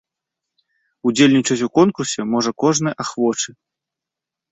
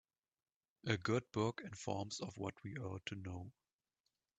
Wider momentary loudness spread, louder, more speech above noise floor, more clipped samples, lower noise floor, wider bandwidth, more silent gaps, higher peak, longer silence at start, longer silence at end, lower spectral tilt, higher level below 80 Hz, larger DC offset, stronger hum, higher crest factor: second, 9 LU vs 12 LU; first, -18 LUFS vs -43 LUFS; first, 68 dB vs 47 dB; neither; about the same, -86 dBFS vs -89 dBFS; about the same, 8.4 kHz vs 9.2 kHz; neither; first, -2 dBFS vs -18 dBFS; first, 1.05 s vs 0.85 s; first, 1.05 s vs 0.85 s; about the same, -4.5 dB/octave vs -5.5 dB/octave; first, -62 dBFS vs -74 dBFS; neither; neither; second, 18 dB vs 26 dB